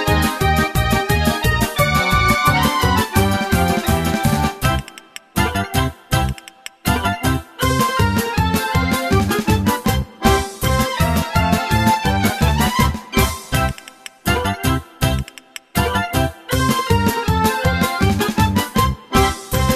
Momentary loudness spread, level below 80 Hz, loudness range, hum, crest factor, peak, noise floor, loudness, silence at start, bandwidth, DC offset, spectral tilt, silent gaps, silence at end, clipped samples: 5 LU; -26 dBFS; 4 LU; none; 16 dB; -2 dBFS; -38 dBFS; -18 LUFS; 0 s; 14.5 kHz; under 0.1%; -5 dB/octave; none; 0 s; under 0.1%